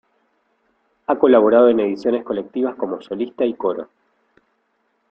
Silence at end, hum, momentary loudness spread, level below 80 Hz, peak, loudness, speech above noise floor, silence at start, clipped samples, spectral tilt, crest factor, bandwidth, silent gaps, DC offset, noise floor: 1.25 s; none; 14 LU; -64 dBFS; -2 dBFS; -18 LUFS; 50 dB; 1.1 s; under 0.1%; -8 dB/octave; 18 dB; 6 kHz; none; under 0.1%; -67 dBFS